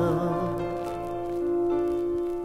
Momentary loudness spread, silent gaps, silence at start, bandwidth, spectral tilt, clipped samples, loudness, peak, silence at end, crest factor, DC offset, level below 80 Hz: 6 LU; none; 0 s; 13 kHz; -8.5 dB/octave; under 0.1%; -28 LUFS; -14 dBFS; 0 s; 14 dB; under 0.1%; -50 dBFS